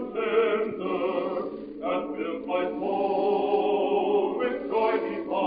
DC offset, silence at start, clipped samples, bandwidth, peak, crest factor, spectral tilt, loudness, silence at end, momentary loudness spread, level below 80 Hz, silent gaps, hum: under 0.1%; 0 s; under 0.1%; 5 kHz; -12 dBFS; 14 dB; -3.5 dB/octave; -27 LUFS; 0 s; 7 LU; -62 dBFS; none; none